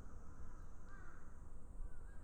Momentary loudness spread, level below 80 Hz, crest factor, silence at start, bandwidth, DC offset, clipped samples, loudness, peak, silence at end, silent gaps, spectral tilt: 3 LU; -52 dBFS; 12 dB; 0 s; 9 kHz; under 0.1%; under 0.1%; -59 LUFS; -36 dBFS; 0 s; none; -6.5 dB/octave